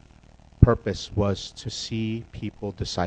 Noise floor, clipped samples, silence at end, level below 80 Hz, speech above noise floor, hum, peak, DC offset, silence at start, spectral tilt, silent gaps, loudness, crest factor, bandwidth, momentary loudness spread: -52 dBFS; under 0.1%; 0 s; -36 dBFS; 24 dB; none; 0 dBFS; under 0.1%; 0.6 s; -6.5 dB/octave; none; -26 LUFS; 26 dB; 9 kHz; 13 LU